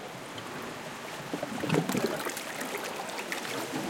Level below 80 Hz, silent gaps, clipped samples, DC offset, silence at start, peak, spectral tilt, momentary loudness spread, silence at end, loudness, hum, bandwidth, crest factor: -70 dBFS; none; under 0.1%; under 0.1%; 0 s; -12 dBFS; -4 dB/octave; 10 LU; 0 s; -34 LUFS; none; 17 kHz; 22 dB